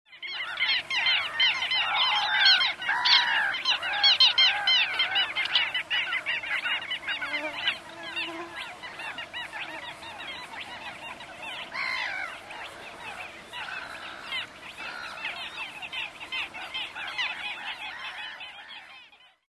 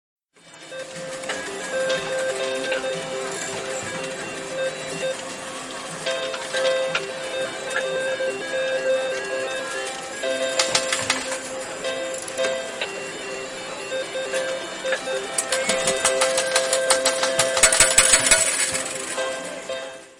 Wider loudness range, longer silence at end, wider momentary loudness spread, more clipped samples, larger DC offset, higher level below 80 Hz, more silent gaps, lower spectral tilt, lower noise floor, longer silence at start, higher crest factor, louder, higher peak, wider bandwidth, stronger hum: first, 15 LU vs 10 LU; first, 0.35 s vs 0.05 s; first, 19 LU vs 14 LU; neither; neither; second, -68 dBFS vs -52 dBFS; neither; about the same, 0 dB/octave vs -0.5 dB/octave; first, -54 dBFS vs -47 dBFS; second, 0.1 s vs 0.45 s; about the same, 22 dB vs 24 dB; second, -25 LUFS vs -22 LUFS; second, -6 dBFS vs -2 dBFS; second, 13 kHz vs 17.5 kHz; neither